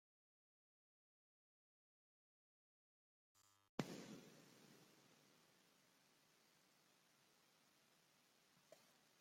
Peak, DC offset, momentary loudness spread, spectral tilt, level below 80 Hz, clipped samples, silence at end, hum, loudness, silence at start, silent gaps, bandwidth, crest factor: -26 dBFS; under 0.1%; 17 LU; -5 dB/octave; under -90 dBFS; under 0.1%; 0 s; none; -55 LUFS; 3.35 s; 3.69-3.78 s; 16 kHz; 38 dB